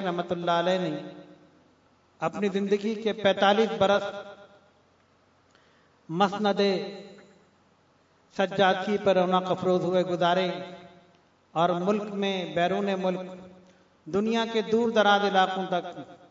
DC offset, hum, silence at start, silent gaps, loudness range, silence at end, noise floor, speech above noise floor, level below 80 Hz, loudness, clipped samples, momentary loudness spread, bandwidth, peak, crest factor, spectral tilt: under 0.1%; none; 0 s; none; 5 LU; 0.15 s; -63 dBFS; 38 dB; -72 dBFS; -26 LUFS; under 0.1%; 15 LU; 7.8 kHz; -8 dBFS; 20 dB; -5.5 dB/octave